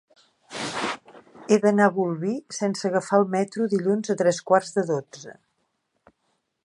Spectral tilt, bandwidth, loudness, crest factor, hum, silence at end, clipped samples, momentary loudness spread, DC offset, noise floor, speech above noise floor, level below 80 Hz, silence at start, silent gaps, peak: -5.5 dB/octave; 11.5 kHz; -24 LUFS; 20 dB; none; 1.3 s; under 0.1%; 17 LU; under 0.1%; -74 dBFS; 51 dB; -72 dBFS; 0.5 s; none; -4 dBFS